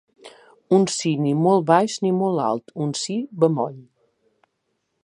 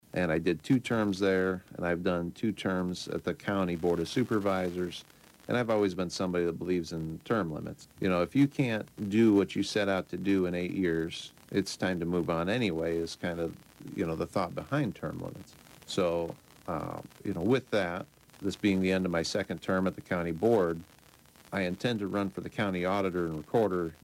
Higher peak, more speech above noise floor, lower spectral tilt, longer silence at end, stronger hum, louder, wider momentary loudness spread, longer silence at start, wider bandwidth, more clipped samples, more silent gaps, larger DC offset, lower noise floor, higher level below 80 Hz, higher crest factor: first, -2 dBFS vs -14 dBFS; first, 54 dB vs 28 dB; about the same, -5.5 dB/octave vs -6 dB/octave; first, 1.2 s vs 0.1 s; neither; first, -21 LUFS vs -31 LUFS; about the same, 8 LU vs 10 LU; about the same, 0.25 s vs 0.15 s; second, 11 kHz vs 16 kHz; neither; neither; neither; first, -74 dBFS vs -58 dBFS; second, -70 dBFS vs -60 dBFS; about the same, 20 dB vs 16 dB